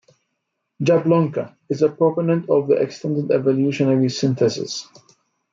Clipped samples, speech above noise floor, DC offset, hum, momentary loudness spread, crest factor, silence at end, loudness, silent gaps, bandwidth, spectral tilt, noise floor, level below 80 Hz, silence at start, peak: under 0.1%; 57 dB; under 0.1%; none; 9 LU; 16 dB; 0.7 s; -19 LUFS; none; 7.6 kHz; -6.5 dB/octave; -76 dBFS; -66 dBFS; 0.8 s; -4 dBFS